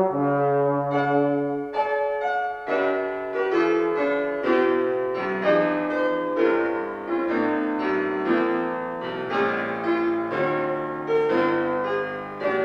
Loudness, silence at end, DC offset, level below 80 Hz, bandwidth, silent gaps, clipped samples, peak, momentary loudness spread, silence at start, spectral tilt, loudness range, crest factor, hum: -24 LUFS; 0 s; under 0.1%; -62 dBFS; 6.6 kHz; none; under 0.1%; -8 dBFS; 6 LU; 0 s; -7.5 dB/octave; 2 LU; 16 dB; none